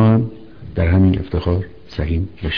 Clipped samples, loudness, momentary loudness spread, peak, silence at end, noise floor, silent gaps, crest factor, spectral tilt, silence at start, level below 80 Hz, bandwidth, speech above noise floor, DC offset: under 0.1%; -18 LUFS; 14 LU; -4 dBFS; 0 s; -35 dBFS; none; 14 dB; -10 dB/octave; 0 s; -30 dBFS; 5.4 kHz; 18 dB; 0.9%